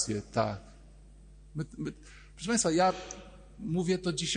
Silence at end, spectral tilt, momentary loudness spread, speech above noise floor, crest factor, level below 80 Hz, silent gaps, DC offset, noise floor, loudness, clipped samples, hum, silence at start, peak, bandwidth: 0 s; -4 dB/octave; 19 LU; 22 dB; 18 dB; -54 dBFS; none; under 0.1%; -53 dBFS; -31 LUFS; under 0.1%; none; 0 s; -14 dBFS; 10 kHz